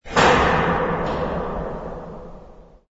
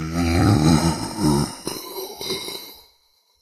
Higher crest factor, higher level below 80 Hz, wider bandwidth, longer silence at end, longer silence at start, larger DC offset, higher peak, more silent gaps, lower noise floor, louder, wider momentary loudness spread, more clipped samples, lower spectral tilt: about the same, 20 dB vs 18 dB; about the same, -36 dBFS vs -36 dBFS; second, 8 kHz vs 15.5 kHz; second, 0.3 s vs 0.65 s; about the same, 0.05 s vs 0 s; neither; about the same, -2 dBFS vs -4 dBFS; neither; second, -44 dBFS vs -62 dBFS; about the same, -20 LUFS vs -21 LUFS; first, 22 LU vs 15 LU; neither; about the same, -5 dB/octave vs -5.5 dB/octave